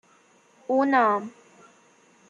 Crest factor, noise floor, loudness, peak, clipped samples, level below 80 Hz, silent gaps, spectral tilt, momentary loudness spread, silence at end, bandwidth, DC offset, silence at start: 18 dB; -59 dBFS; -23 LUFS; -8 dBFS; under 0.1%; -84 dBFS; none; -6 dB/octave; 22 LU; 1 s; 7.6 kHz; under 0.1%; 0.7 s